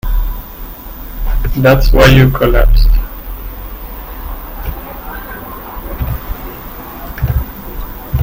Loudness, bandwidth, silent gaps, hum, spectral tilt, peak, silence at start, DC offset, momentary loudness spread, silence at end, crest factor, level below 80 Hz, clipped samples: -14 LUFS; 16.5 kHz; none; none; -6.5 dB/octave; 0 dBFS; 0.05 s; under 0.1%; 19 LU; 0 s; 14 dB; -16 dBFS; 0.2%